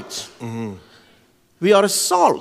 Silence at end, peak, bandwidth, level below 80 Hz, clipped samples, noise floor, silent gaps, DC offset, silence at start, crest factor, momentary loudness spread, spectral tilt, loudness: 0 s; -2 dBFS; 16 kHz; -68 dBFS; under 0.1%; -56 dBFS; none; under 0.1%; 0 s; 18 dB; 16 LU; -3.5 dB/octave; -17 LUFS